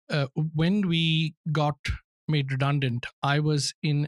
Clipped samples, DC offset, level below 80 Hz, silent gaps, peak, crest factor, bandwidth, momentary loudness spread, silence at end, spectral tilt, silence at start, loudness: under 0.1%; under 0.1%; -46 dBFS; 1.37-1.44 s, 1.79-1.84 s, 2.04-2.28 s, 3.13-3.22 s, 3.74-3.82 s; -10 dBFS; 16 dB; 11.5 kHz; 6 LU; 0 s; -5.5 dB/octave; 0.1 s; -26 LUFS